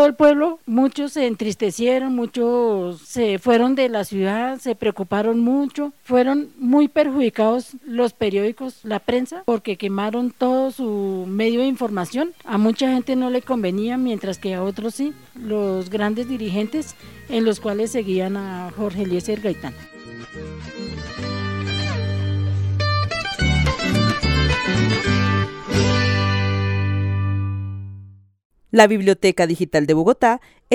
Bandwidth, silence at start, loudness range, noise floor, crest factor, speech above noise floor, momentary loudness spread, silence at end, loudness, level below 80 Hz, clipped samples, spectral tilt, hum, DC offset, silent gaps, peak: 16 kHz; 0 s; 6 LU; -42 dBFS; 20 dB; 23 dB; 11 LU; 0 s; -20 LUFS; -38 dBFS; under 0.1%; -6 dB/octave; none; 0.2%; 28.45-28.50 s; 0 dBFS